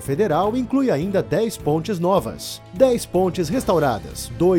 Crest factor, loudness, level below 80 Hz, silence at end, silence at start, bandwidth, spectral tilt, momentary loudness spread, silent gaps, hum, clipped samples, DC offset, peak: 18 dB; -20 LUFS; -42 dBFS; 0 s; 0 s; 18.5 kHz; -6 dB/octave; 9 LU; none; none; under 0.1%; under 0.1%; -2 dBFS